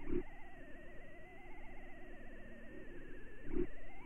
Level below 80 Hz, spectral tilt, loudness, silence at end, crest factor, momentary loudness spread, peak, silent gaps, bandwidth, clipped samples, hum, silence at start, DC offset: -48 dBFS; -8 dB/octave; -51 LUFS; 0 s; 18 dB; 13 LU; -24 dBFS; none; 3.3 kHz; under 0.1%; none; 0 s; under 0.1%